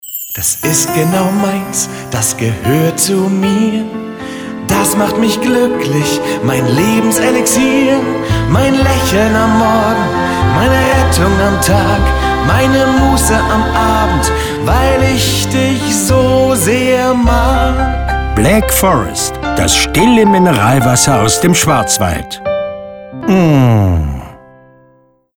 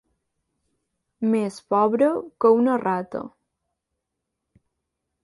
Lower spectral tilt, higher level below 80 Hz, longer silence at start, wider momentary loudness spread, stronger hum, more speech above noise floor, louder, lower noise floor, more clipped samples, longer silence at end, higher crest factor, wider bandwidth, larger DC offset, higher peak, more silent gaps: second, -4.5 dB/octave vs -7.5 dB/octave; first, -22 dBFS vs -70 dBFS; second, 0.05 s vs 1.2 s; second, 7 LU vs 13 LU; neither; second, 39 dB vs 60 dB; first, -11 LUFS vs -22 LUFS; second, -50 dBFS vs -81 dBFS; neither; second, 1.05 s vs 1.95 s; second, 12 dB vs 18 dB; first, over 20 kHz vs 11.5 kHz; neither; first, 0 dBFS vs -6 dBFS; neither